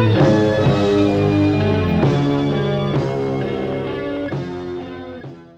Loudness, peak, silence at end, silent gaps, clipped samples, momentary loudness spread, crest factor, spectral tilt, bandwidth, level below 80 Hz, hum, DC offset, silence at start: -18 LUFS; -2 dBFS; 0.15 s; none; under 0.1%; 14 LU; 16 dB; -8 dB/octave; 8.2 kHz; -42 dBFS; none; under 0.1%; 0 s